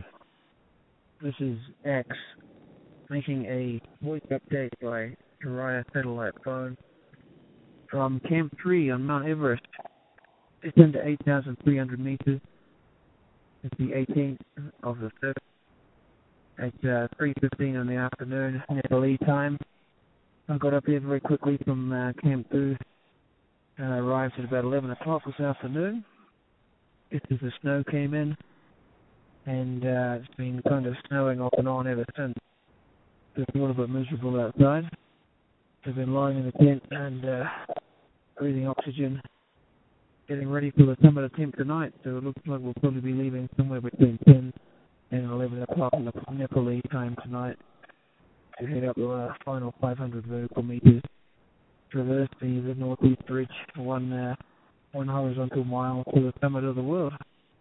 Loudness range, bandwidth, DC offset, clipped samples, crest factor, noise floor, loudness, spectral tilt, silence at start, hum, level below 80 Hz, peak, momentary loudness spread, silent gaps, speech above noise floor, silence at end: 9 LU; 4 kHz; under 0.1%; under 0.1%; 28 dB; -66 dBFS; -27 LUFS; -12.5 dB/octave; 0 s; none; -58 dBFS; 0 dBFS; 15 LU; none; 40 dB; 0.4 s